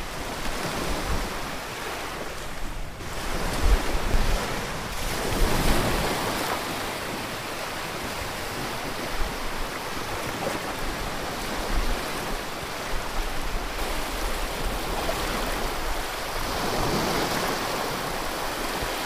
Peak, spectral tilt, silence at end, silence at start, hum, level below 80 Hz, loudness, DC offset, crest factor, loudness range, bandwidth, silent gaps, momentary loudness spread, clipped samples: -8 dBFS; -3.5 dB/octave; 0 s; 0 s; none; -32 dBFS; -29 LUFS; under 0.1%; 20 dB; 4 LU; 16 kHz; none; 6 LU; under 0.1%